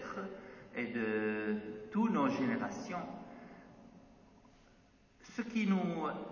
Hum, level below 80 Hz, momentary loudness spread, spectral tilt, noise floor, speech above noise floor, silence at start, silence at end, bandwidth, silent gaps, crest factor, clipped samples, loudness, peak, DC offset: none; -72 dBFS; 20 LU; -7 dB/octave; -65 dBFS; 29 dB; 0 s; 0 s; 7.2 kHz; none; 18 dB; under 0.1%; -37 LUFS; -20 dBFS; under 0.1%